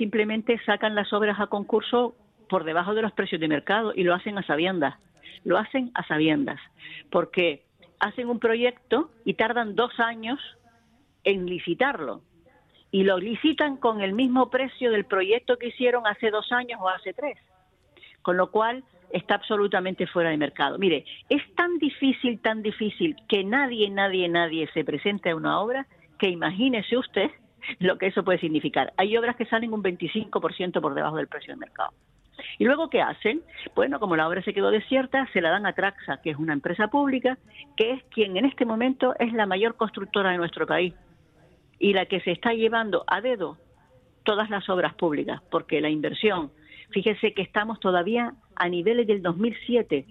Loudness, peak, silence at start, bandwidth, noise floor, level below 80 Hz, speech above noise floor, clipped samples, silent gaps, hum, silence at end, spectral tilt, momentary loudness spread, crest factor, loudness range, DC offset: -25 LUFS; -8 dBFS; 0 s; 5.2 kHz; -62 dBFS; -64 dBFS; 37 dB; under 0.1%; none; none; 0.1 s; -7.5 dB/octave; 7 LU; 18 dB; 3 LU; under 0.1%